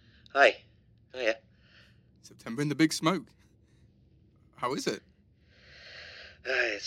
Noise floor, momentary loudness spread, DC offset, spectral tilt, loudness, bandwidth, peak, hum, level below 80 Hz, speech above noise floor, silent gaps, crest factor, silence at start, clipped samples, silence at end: -62 dBFS; 23 LU; under 0.1%; -4 dB/octave; -29 LUFS; 16 kHz; -10 dBFS; none; -68 dBFS; 34 dB; none; 24 dB; 0.35 s; under 0.1%; 0 s